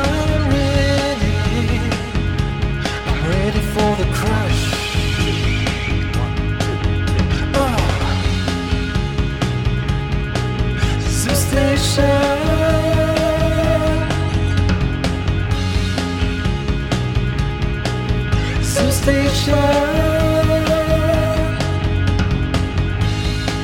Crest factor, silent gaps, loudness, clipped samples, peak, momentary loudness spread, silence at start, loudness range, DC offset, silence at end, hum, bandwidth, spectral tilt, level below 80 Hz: 14 dB; none; -18 LUFS; under 0.1%; -2 dBFS; 5 LU; 0 s; 3 LU; 0.8%; 0 s; none; 17 kHz; -5.5 dB/octave; -24 dBFS